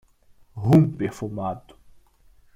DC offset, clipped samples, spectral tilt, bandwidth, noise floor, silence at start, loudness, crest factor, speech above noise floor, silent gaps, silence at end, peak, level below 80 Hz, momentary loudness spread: under 0.1%; under 0.1%; -9 dB/octave; 14 kHz; -55 dBFS; 0.55 s; -22 LUFS; 20 dB; 34 dB; none; 0.95 s; -6 dBFS; -54 dBFS; 19 LU